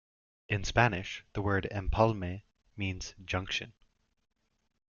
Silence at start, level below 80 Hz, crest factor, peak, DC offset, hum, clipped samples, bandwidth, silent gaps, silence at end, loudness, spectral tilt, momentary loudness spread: 0.5 s; -46 dBFS; 24 dB; -10 dBFS; under 0.1%; none; under 0.1%; 7.2 kHz; none; 1.3 s; -32 LUFS; -5.5 dB/octave; 13 LU